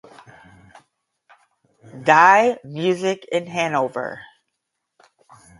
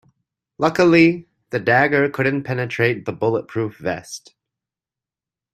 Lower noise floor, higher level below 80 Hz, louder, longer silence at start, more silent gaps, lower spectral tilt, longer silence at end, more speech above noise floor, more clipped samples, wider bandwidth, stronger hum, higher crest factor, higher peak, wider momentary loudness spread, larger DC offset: second, -78 dBFS vs -89 dBFS; second, -68 dBFS vs -58 dBFS; about the same, -18 LUFS vs -18 LUFS; first, 1.95 s vs 0.6 s; neither; second, -4.5 dB/octave vs -6.5 dB/octave; about the same, 1.35 s vs 1.35 s; second, 60 dB vs 71 dB; neither; second, 11.5 kHz vs 14 kHz; neither; about the same, 22 dB vs 20 dB; about the same, 0 dBFS vs -2 dBFS; about the same, 16 LU vs 14 LU; neither